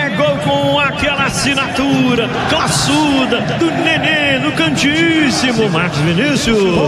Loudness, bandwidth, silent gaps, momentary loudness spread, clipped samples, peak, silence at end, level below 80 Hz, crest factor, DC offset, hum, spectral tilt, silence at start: -13 LUFS; 14.5 kHz; none; 3 LU; under 0.1%; -2 dBFS; 0 s; -38 dBFS; 12 dB; under 0.1%; none; -4.5 dB/octave; 0 s